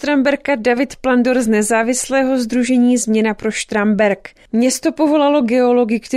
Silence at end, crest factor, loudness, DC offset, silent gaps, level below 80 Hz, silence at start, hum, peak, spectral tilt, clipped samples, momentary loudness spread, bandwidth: 0 s; 12 dB; -15 LUFS; under 0.1%; none; -50 dBFS; 0 s; none; -2 dBFS; -4 dB/octave; under 0.1%; 4 LU; 15 kHz